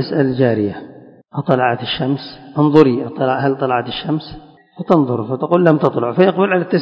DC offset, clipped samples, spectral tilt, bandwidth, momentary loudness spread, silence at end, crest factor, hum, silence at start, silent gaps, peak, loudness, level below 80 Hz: under 0.1%; 0.2%; -9 dB/octave; 6.4 kHz; 11 LU; 0 s; 16 dB; none; 0 s; none; 0 dBFS; -16 LUFS; -52 dBFS